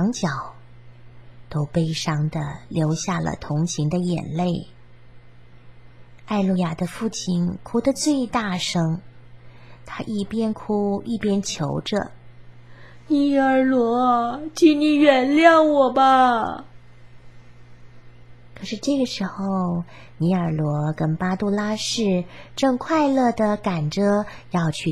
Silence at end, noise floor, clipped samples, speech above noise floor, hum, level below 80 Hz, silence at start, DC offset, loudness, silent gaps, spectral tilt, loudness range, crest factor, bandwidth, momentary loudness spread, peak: 0 s; -48 dBFS; under 0.1%; 27 dB; none; -52 dBFS; 0 s; 0.5%; -21 LUFS; none; -5.5 dB/octave; 10 LU; 20 dB; 13 kHz; 12 LU; -2 dBFS